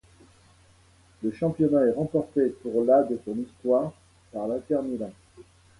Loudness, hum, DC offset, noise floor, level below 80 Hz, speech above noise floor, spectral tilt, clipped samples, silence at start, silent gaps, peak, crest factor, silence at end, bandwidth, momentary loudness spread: -26 LUFS; none; under 0.1%; -58 dBFS; -60 dBFS; 33 dB; -9 dB/octave; under 0.1%; 1.2 s; none; -10 dBFS; 18 dB; 0.35 s; 11.5 kHz; 13 LU